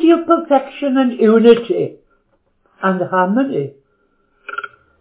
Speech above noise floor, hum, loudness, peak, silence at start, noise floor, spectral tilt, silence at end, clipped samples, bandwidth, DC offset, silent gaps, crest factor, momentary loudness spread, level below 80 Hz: 47 dB; none; -15 LUFS; 0 dBFS; 0 s; -61 dBFS; -10.5 dB/octave; 0.35 s; 0.1%; 4 kHz; under 0.1%; none; 16 dB; 18 LU; -62 dBFS